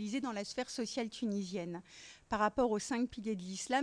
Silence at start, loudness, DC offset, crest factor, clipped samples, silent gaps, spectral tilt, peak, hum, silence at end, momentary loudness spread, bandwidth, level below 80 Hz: 0 s; -37 LUFS; under 0.1%; 18 dB; under 0.1%; none; -4 dB/octave; -20 dBFS; none; 0 s; 11 LU; 10.5 kHz; -64 dBFS